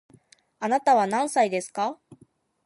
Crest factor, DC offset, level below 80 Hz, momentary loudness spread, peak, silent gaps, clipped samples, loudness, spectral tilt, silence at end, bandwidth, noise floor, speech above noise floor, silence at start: 18 dB; under 0.1%; -76 dBFS; 11 LU; -8 dBFS; none; under 0.1%; -24 LUFS; -4 dB/octave; 0.7 s; 11.5 kHz; -60 dBFS; 37 dB; 0.6 s